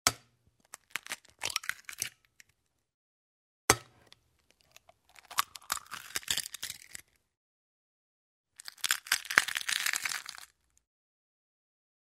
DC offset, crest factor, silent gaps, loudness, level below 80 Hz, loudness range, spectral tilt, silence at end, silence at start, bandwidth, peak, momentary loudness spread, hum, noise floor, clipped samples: under 0.1%; 36 dB; 2.94-3.68 s, 7.37-8.44 s; -33 LUFS; -64 dBFS; 7 LU; 0 dB/octave; 1.65 s; 0.05 s; 16 kHz; -2 dBFS; 21 LU; none; -76 dBFS; under 0.1%